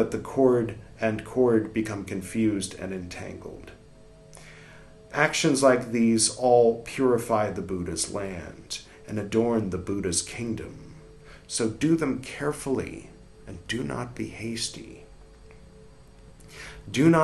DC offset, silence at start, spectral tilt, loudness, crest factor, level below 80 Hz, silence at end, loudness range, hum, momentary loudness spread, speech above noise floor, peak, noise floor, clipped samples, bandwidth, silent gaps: under 0.1%; 0 s; -4.5 dB/octave; -26 LUFS; 22 dB; -54 dBFS; 0 s; 11 LU; none; 21 LU; 25 dB; -4 dBFS; -50 dBFS; under 0.1%; 12.5 kHz; none